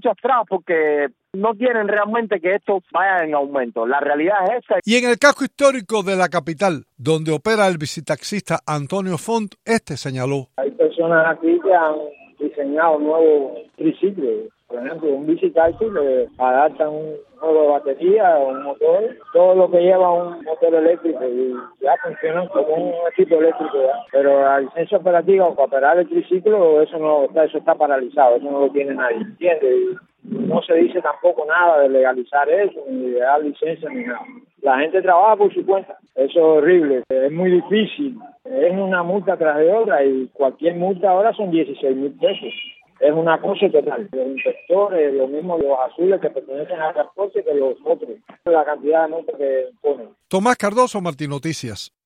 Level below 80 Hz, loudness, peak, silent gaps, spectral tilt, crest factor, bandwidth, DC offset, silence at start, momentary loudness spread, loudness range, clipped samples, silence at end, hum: -62 dBFS; -18 LUFS; 0 dBFS; none; -5.5 dB/octave; 18 dB; 12.5 kHz; under 0.1%; 0.05 s; 10 LU; 4 LU; under 0.1%; 0.2 s; none